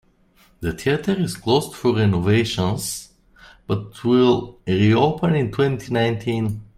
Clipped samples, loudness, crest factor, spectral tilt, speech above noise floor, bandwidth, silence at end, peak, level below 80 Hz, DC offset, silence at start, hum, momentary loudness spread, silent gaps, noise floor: under 0.1%; -20 LUFS; 16 dB; -6 dB/octave; 37 dB; 15.5 kHz; 0.1 s; -4 dBFS; -48 dBFS; under 0.1%; 0.6 s; none; 10 LU; none; -56 dBFS